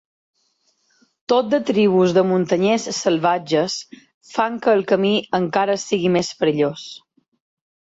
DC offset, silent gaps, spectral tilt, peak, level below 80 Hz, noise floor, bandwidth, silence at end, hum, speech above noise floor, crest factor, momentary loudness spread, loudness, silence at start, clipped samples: under 0.1%; 4.14-4.21 s; -5 dB/octave; -4 dBFS; -62 dBFS; -66 dBFS; 8 kHz; 0.85 s; none; 47 dB; 16 dB; 7 LU; -19 LUFS; 1.3 s; under 0.1%